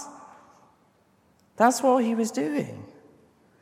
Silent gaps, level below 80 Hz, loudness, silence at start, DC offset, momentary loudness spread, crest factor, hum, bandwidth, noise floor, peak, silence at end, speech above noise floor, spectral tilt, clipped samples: none; -76 dBFS; -24 LUFS; 0 s; under 0.1%; 19 LU; 22 dB; none; 16 kHz; -63 dBFS; -4 dBFS; 0.7 s; 40 dB; -4.5 dB/octave; under 0.1%